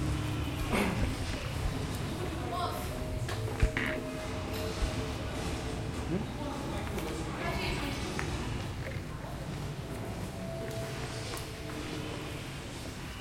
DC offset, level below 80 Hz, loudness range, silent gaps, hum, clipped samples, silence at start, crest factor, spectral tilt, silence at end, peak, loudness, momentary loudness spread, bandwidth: under 0.1%; -42 dBFS; 4 LU; none; none; under 0.1%; 0 s; 22 dB; -5 dB/octave; 0 s; -14 dBFS; -36 LUFS; 7 LU; 16.5 kHz